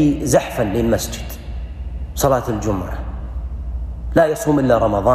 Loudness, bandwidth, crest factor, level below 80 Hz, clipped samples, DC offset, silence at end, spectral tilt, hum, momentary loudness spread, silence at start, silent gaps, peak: -19 LUFS; 15.5 kHz; 14 dB; -28 dBFS; under 0.1%; under 0.1%; 0 s; -6 dB/octave; none; 15 LU; 0 s; none; -4 dBFS